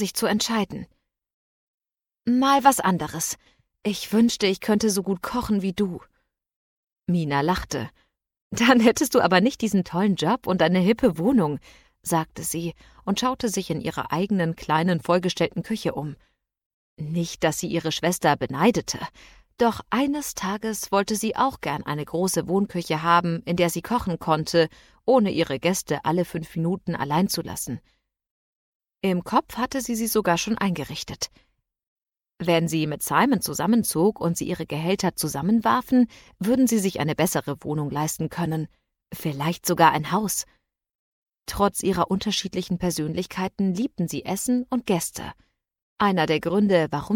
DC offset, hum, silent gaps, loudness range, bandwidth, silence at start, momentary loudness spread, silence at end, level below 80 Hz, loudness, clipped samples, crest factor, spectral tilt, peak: under 0.1%; none; 1.34-1.78 s, 6.56-6.83 s, 8.42-8.51 s, 16.66-16.97 s, 28.31-28.80 s, 31.88-31.96 s, 40.95-41.26 s, 45.82-45.96 s; 5 LU; 18 kHz; 0 s; 11 LU; 0 s; -52 dBFS; -24 LUFS; under 0.1%; 20 dB; -5 dB/octave; -4 dBFS